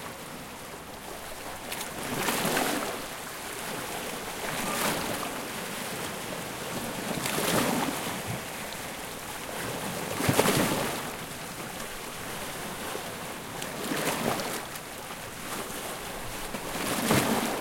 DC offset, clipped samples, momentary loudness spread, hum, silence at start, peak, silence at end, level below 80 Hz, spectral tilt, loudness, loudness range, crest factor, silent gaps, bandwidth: under 0.1%; under 0.1%; 12 LU; none; 0 s; -6 dBFS; 0 s; -54 dBFS; -3 dB/octave; -31 LUFS; 3 LU; 26 dB; none; 17 kHz